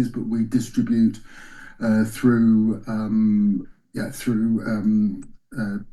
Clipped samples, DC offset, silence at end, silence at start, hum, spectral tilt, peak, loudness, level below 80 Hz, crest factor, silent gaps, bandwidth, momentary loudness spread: under 0.1%; under 0.1%; 0.05 s; 0 s; none; -7.5 dB/octave; -6 dBFS; -22 LUFS; -48 dBFS; 16 dB; none; 12.5 kHz; 13 LU